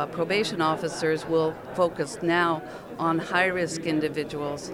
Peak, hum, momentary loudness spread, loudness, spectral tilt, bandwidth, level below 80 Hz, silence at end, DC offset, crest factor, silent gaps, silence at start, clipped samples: -10 dBFS; none; 7 LU; -26 LUFS; -5 dB/octave; 16 kHz; -58 dBFS; 0 s; under 0.1%; 18 dB; none; 0 s; under 0.1%